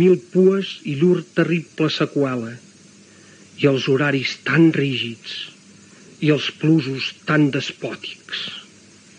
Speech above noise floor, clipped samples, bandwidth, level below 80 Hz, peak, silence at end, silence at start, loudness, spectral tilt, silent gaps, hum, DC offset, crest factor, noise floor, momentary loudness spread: 29 dB; under 0.1%; 9.8 kHz; -70 dBFS; -4 dBFS; 0.55 s; 0 s; -20 LUFS; -6.5 dB/octave; none; none; under 0.1%; 16 dB; -48 dBFS; 14 LU